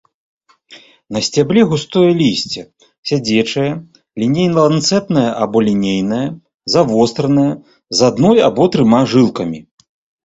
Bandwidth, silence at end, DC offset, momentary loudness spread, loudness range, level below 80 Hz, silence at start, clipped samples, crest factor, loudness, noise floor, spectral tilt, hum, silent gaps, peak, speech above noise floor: 8 kHz; 0.65 s; under 0.1%; 13 LU; 3 LU; -50 dBFS; 0.7 s; under 0.1%; 14 dB; -14 LUFS; -43 dBFS; -5.5 dB/octave; none; 2.98-3.03 s, 6.54-6.60 s; 0 dBFS; 30 dB